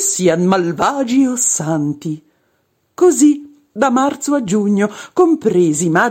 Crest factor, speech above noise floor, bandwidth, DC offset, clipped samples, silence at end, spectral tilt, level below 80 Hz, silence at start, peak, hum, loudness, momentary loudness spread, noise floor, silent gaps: 14 dB; 49 dB; 16.5 kHz; under 0.1%; under 0.1%; 0 s; -4.5 dB/octave; -56 dBFS; 0 s; -2 dBFS; none; -15 LUFS; 8 LU; -63 dBFS; none